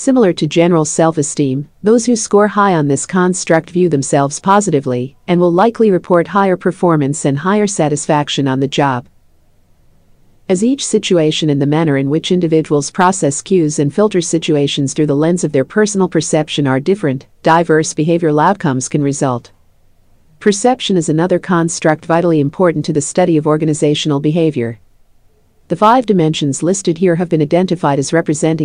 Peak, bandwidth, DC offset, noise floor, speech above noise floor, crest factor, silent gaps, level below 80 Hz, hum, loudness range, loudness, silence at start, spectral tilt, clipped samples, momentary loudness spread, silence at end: 0 dBFS; 10.5 kHz; under 0.1%; -50 dBFS; 37 dB; 14 dB; none; -52 dBFS; none; 3 LU; -13 LUFS; 0 s; -5.5 dB/octave; under 0.1%; 5 LU; 0 s